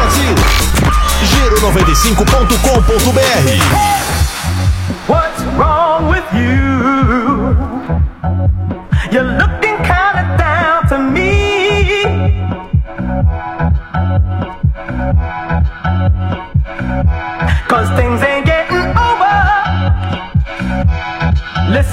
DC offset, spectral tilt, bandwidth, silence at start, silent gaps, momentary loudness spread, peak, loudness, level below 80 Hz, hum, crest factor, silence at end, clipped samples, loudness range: under 0.1%; -5 dB/octave; 16.5 kHz; 0 s; none; 7 LU; 0 dBFS; -13 LUFS; -18 dBFS; none; 12 dB; 0 s; under 0.1%; 5 LU